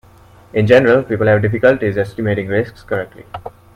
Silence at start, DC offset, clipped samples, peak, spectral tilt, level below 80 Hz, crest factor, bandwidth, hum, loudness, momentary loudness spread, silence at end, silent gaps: 0.55 s; under 0.1%; under 0.1%; 0 dBFS; -8 dB/octave; -46 dBFS; 16 dB; 9.8 kHz; none; -15 LUFS; 18 LU; 0.25 s; none